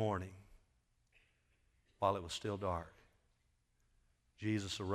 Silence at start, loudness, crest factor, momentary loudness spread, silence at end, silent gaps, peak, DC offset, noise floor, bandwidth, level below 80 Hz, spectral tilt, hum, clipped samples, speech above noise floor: 0 s; -40 LUFS; 24 dB; 8 LU; 0 s; none; -20 dBFS; under 0.1%; -78 dBFS; 14 kHz; -68 dBFS; -5.5 dB/octave; none; under 0.1%; 39 dB